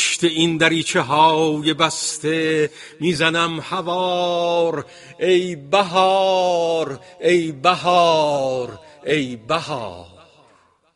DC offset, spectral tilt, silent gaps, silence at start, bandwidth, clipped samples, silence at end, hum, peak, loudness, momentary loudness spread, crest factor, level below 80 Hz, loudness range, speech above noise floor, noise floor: under 0.1%; -4 dB/octave; none; 0 s; 11.5 kHz; under 0.1%; 0.9 s; none; 0 dBFS; -18 LUFS; 10 LU; 18 dB; -60 dBFS; 3 LU; 37 dB; -56 dBFS